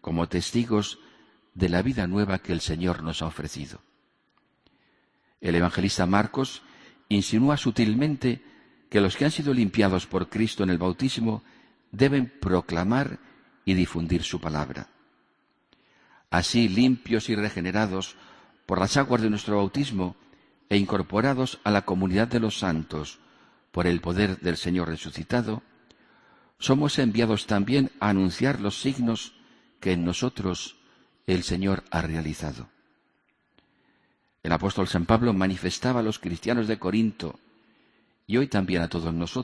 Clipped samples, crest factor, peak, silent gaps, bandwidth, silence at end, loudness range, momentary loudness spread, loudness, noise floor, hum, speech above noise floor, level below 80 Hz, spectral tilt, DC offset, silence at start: under 0.1%; 22 dB; -4 dBFS; none; 11 kHz; 0 s; 5 LU; 11 LU; -26 LUFS; -70 dBFS; none; 45 dB; -48 dBFS; -6 dB/octave; under 0.1%; 0.05 s